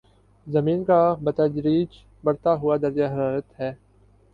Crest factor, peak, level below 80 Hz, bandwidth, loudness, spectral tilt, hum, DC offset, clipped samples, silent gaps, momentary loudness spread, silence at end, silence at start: 16 dB; -8 dBFS; -56 dBFS; 5 kHz; -23 LUFS; -10 dB/octave; 50 Hz at -50 dBFS; under 0.1%; under 0.1%; none; 12 LU; 0.6 s; 0.45 s